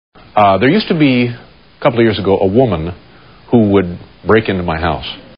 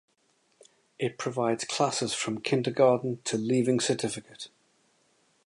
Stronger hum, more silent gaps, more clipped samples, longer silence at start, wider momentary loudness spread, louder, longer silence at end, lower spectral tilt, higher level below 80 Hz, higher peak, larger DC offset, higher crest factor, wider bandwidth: neither; neither; neither; second, 0.35 s vs 1 s; about the same, 11 LU vs 12 LU; first, -13 LUFS vs -28 LUFS; second, 0.15 s vs 1 s; about the same, -5 dB/octave vs -4.5 dB/octave; first, -38 dBFS vs -72 dBFS; first, 0 dBFS vs -10 dBFS; first, 0.4% vs under 0.1%; second, 14 dB vs 20 dB; second, 5.4 kHz vs 11.5 kHz